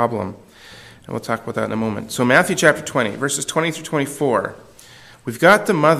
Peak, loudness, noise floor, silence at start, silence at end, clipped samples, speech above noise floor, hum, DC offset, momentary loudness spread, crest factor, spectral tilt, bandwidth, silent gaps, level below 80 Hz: 0 dBFS; -18 LUFS; -44 dBFS; 0 s; 0 s; under 0.1%; 26 dB; none; under 0.1%; 16 LU; 20 dB; -4.5 dB/octave; 15.5 kHz; none; -56 dBFS